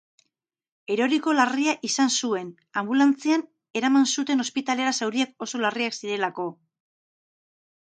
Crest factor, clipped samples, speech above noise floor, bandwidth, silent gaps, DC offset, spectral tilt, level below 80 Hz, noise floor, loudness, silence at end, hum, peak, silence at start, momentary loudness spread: 20 dB; under 0.1%; 58 dB; 9.4 kHz; none; under 0.1%; -2.5 dB/octave; -80 dBFS; -81 dBFS; -24 LUFS; 1.4 s; none; -6 dBFS; 0.9 s; 10 LU